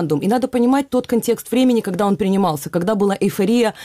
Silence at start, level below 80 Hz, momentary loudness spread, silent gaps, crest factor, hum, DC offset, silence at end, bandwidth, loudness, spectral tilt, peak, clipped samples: 0 s; -54 dBFS; 3 LU; none; 10 dB; none; under 0.1%; 0 s; 16 kHz; -18 LUFS; -6 dB/octave; -6 dBFS; under 0.1%